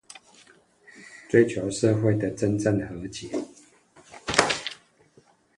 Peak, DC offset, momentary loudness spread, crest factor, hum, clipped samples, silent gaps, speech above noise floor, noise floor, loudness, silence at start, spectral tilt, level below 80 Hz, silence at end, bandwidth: 0 dBFS; under 0.1%; 24 LU; 28 dB; none; under 0.1%; none; 36 dB; -60 dBFS; -25 LUFS; 0.95 s; -5 dB/octave; -56 dBFS; 0.85 s; 11.5 kHz